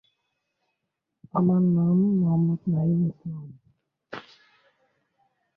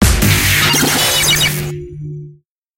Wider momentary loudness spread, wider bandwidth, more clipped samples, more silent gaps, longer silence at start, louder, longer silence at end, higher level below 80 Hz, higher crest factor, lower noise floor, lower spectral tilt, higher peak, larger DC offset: about the same, 20 LU vs 18 LU; second, 4.7 kHz vs 17 kHz; neither; neither; first, 1.35 s vs 0 s; second, -23 LUFS vs -11 LUFS; first, 1.35 s vs 0.45 s; second, -64 dBFS vs -24 dBFS; about the same, 16 dB vs 14 dB; first, -82 dBFS vs -43 dBFS; first, -12 dB/octave vs -2.5 dB/octave; second, -10 dBFS vs 0 dBFS; neither